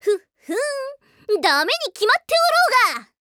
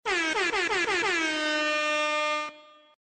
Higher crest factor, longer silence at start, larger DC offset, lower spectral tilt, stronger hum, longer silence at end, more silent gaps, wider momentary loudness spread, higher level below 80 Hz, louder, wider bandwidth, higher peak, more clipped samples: about the same, 16 dB vs 12 dB; about the same, 0.05 s vs 0.05 s; neither; about the same, 0 dB/octave vs -1 dB/octave; neither; about the same, 0.3 s vs 0.4 s; neither; first, 15 LU vs 3 LU; second, -70 dBFS vs -62 dBFS; first, -19 LUFS vs -26 LUFS; first, 18.5 kHz vs 9.4 kHz; first, -4 dBFS vs -16 dBFS; neither